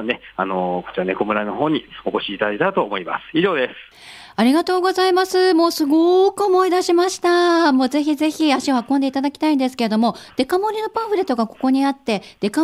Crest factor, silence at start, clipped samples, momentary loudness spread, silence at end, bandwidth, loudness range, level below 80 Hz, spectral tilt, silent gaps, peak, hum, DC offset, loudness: 14 dB; 0 s; under 0.1%; 8 LU; 0 s; 15 kHz; 5 LU; -60 dBFS; -4.5 dB/octave; none; -4 dBFS; none; under 0.1%; -18 LUFS